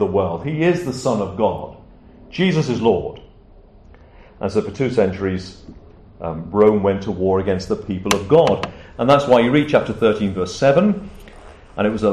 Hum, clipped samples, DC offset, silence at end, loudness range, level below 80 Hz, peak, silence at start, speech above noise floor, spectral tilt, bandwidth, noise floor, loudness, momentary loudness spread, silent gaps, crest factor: none; under 0.1%; under 0.1%; 0 s; 7 LU; -44 dBFS; -2 dBFS; 0 s; 28 dB; -6.5 dB/octave; 13 kHz; -45 dBFS; -18 LUFS; 14 LU; none; 18 dB